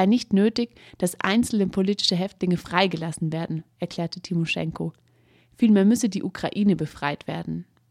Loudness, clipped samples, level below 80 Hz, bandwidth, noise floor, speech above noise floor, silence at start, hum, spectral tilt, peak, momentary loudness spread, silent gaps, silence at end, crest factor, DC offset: -24 LUFS; under 0.1%; -56 dBFS; 14.5 kHz; -59 dBFS; 36 dB; 0 s; none; -5.5 dB/octave; -2 dBFS; 12 LU; none; 0.3 s; 20 dB; under 0.1%